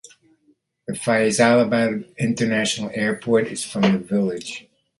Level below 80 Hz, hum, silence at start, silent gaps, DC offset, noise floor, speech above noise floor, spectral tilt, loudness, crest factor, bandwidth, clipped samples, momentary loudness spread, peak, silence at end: -60 dBFS; none; 0.9 s; none; under 0.1%; -63 dBFS; 43 dB; -4.5 dB/octave; -20 LUFS; 20 dB; 11.5 kHz; under 0.1%; 15 LU; -2 dBFS; 0.4 s